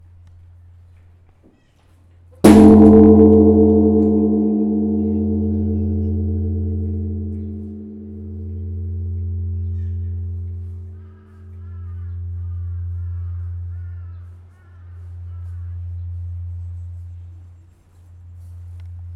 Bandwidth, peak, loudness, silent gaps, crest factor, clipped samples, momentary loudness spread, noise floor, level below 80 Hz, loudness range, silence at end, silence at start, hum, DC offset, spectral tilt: 13 kHz; 0 dBFS; -15 LUFS; none; 18 dB; under 0.1%; 26 LU; -53 dBFS; -40 dBFS; 21 LU; 0 s; 2.45 s; none; under 0.1%; -9 dB/octave